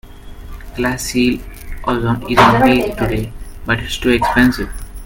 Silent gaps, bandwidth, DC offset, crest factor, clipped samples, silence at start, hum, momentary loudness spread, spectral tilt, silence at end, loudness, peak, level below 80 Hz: none; 17 kHz; under 0.1%; 16 dB; under 0.1%; 0.05 s; none; 19 LU; -5 dB/octave; 0 s; -15 LUFS; 0 dBFS; -30 dBFS